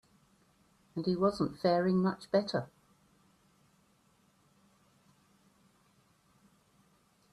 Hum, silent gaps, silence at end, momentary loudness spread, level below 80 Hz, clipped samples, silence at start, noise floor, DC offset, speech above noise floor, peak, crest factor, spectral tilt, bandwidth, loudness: none; none; 4.7 s; 10 LU; -70 dBFS; under 0.1%; 0.95 s; -69 dBFS; under 0.1%; 39 dB; -16 dBFS; 20 dB; -7.5 dB/octave; 11.5 kHz; -32 LUFS